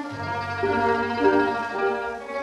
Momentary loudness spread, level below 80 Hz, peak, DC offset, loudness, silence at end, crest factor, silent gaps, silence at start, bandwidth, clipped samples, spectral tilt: 9 LU; -56 dBFS; -6 dBFS; under 0.1%; -24 LUFS; 0 s; 18 dB; none; 0 s; 10.5 kHz; under 0.1%; -6 dB/octave